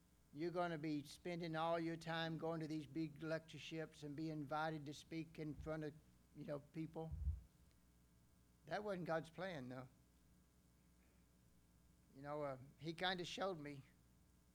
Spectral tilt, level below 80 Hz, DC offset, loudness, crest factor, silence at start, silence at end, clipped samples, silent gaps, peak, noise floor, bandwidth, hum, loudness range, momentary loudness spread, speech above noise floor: -6 dB/octave; -64 dBFS; under 0.1%; -48 LUFS; 20 dB; 0.35 s; 0.6 s; under 0.1%; none; -28 dBFS; -73 dBFS; 19.5 kHz; none; 7 LU; 12 LU; 26 dB